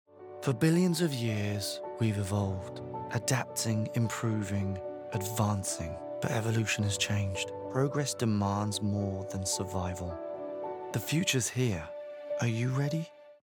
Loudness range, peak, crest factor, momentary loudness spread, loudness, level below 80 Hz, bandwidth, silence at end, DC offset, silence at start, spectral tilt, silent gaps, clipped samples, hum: 2 LU; -14 dBFS; 18 dB; 10 LU; -32 LUFS; -60 dBFS; 20 kHz; 0.15 s; under 0.1%; 0.15 s; -5 dB/octave; none; under 0.1%; none